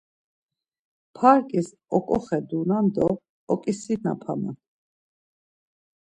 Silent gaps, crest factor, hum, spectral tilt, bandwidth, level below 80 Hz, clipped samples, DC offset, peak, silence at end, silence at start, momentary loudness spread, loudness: 3.29-3.47 s; 22 dB; none; -7.5 dB/octave; 10 kHz; -60 dBFS; under 0.1%; under 0.1%; -4 dBFS; 1.55 s; 1.15 s; 12 LU; -24 LUFS